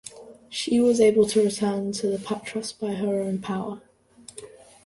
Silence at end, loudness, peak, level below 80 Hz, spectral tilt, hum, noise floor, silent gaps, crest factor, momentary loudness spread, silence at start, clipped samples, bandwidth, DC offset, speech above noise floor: 0.35 s; -24 LUFS; -8 dBFS; -62 dBFS; -5 dB/octave; none; -50 dBFS; none; 18 dB; 24 LU; 0.05 s; under 0.1%; 11.5 kHz; under 0.1%; 27 dB